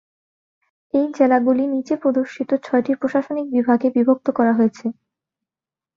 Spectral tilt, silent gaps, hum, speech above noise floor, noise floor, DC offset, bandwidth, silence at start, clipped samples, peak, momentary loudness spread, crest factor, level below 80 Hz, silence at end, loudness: -7.5 dB/octave; none; none; over 72 dB; under -90 dBFS; under 0.1%; 7.2 kHz; 0.95 s; under 0.1%; -2 dBFS; 6 LU; 18 dB; -66 dBFS; 1.05 s; -19 LUFS